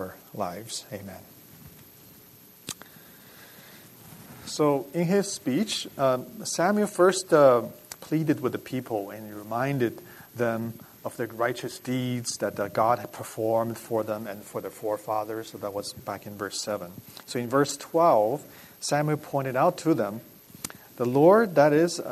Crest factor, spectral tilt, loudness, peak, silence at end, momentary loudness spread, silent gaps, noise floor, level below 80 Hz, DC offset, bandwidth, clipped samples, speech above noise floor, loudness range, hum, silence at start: 20 dB; -5 dB/octave; -26 LUFS; -6 dBFS; 0 s; 19 LU; none; -52 dBFS; -68 dBFS; under 0.1%; 13.5 kHz; under 0.1%; 26 dB; 9 LU; none; 0 s